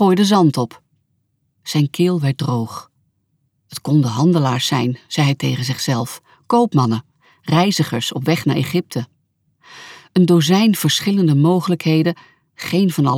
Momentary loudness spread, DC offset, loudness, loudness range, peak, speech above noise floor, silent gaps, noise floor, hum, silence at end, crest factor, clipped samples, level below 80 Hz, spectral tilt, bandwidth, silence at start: 15 LU; under 0.1%; -17 LUFS; 4 LU; -2 dBFS; 51 dB; none; -67 dBFS; none; 0 s; 14 dB; under 0.1%; -62 dBFS; -6 dB/octave; 17 kHz; 0 s